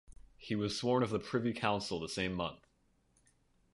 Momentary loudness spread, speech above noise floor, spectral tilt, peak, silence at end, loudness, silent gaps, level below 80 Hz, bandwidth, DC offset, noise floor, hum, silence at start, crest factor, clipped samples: 8 LU; 38 dB; -5 dB/octave; -16 dBFS; 1.2 s; -36 LUFS; none; -62 dBFS; 11.5 kHz; under 0.1%; -73 dBFS; none; 0.1 s; 22 dB; under 0.1%